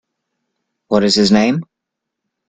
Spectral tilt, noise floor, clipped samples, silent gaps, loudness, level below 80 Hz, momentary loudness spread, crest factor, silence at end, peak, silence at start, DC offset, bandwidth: -5 dB/octave; -79 dBFS; under 0.1%; none; -14 LUFS; -50 dBFS; 8 LU; 18 dB; 0.85 s; 0 dBFS; 0.9 s; under 0.1%; 9.2 kHz